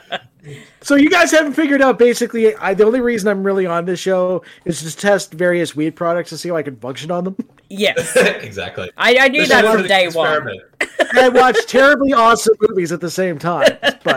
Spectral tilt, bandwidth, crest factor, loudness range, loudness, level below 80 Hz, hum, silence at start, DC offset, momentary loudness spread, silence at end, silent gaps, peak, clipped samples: -4 dB/octave; 16.5 kHz; 12 dB; 7 LU; -14 LUFS; -52 dBFS; none; 0.1 s; under 0.1%; 14 LU; 0 s; none; -2 dBFS; under 0.1%